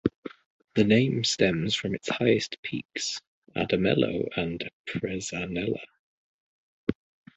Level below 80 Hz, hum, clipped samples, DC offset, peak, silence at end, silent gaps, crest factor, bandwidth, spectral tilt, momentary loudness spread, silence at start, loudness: -56 dBFS; none; under 0.1%; under 0.1%; -8 dBFS; 0.45 s; 0.15-0.23 s, 0.46-0.59 s, 2.58-2.63 s, 2.85-2.89 s, 3.27-3.42 s, 4.73-4.84 s, 5.99-6.87 s; 20 dB; 8.4 kHz; -5 dB/octave; 13 LU; 0.05 s; -28 LUFS